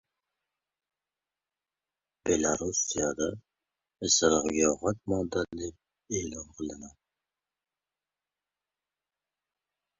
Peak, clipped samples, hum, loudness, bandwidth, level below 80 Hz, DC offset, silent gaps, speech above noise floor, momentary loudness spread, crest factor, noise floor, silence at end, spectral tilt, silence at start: -10 dBFS; under 0.1%; none; -29 LUFS; 8 kHz; -56 dBFS; under 0.1%; none; over 61 dB; 15 LU; 22 dB; under -90 dBFS; 3.1 s; -3 dB/octave; 2.25 s